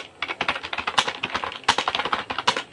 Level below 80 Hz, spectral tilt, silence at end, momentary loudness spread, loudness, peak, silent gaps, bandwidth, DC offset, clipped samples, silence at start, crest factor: -58 dBFS; -1.5 dB/octave; 0 s; 5 LU; -24 LUFS; -2 dBFS; none; 11.5 kHz; under 0.1%; under 0.1%; 0 s; 24 dB